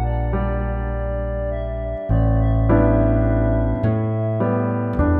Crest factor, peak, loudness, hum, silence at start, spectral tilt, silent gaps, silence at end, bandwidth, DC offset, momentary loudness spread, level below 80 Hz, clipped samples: 16 dB; -4 dBFS; -20 LUFS; none; 0 s; -12.5 dB/octave; none; 0 s; 3.5 kHz; under 0.1%; 8 LU; -24 dBFS; under 0.1%